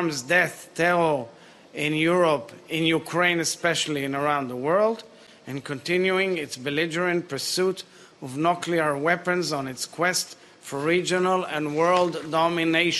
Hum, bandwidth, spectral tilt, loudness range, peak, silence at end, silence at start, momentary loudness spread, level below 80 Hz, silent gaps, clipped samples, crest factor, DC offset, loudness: none; 12.5 kHz; -4 dB/octave; 2 LU; -6 dBFS; 0 s; 0 s; 12 LU; -68 dBFS; none; under 0.1%; 20 dB; under 0.1%; -24 LUFS